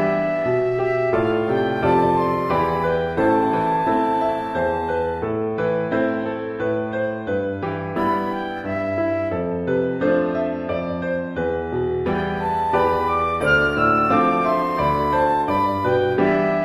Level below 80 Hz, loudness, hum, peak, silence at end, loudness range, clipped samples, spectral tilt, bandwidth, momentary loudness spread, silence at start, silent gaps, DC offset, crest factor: -42 dBFS; -21 LUFS; none; -4 dBFS; 0 s; 5 LU; under 0.1%; -8 dB/octave; 13.5 kHz; 7 LU; 0 s; none; under 0.1%; 16 dB